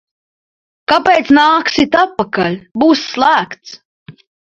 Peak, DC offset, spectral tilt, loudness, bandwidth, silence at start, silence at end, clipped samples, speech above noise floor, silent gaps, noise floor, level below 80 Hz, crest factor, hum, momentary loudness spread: 0 dBFS; under 0.1%; -4.5 dB/octave; -12 LUFS; 7.8 kHz; 0.9 s; 0.4 s; under 0.1%; over 78 dB; 2.71-2.75 s, 3.85-4.06 s; under -90 dBFS; -50 dBFS; 14 dB; none; 9 LU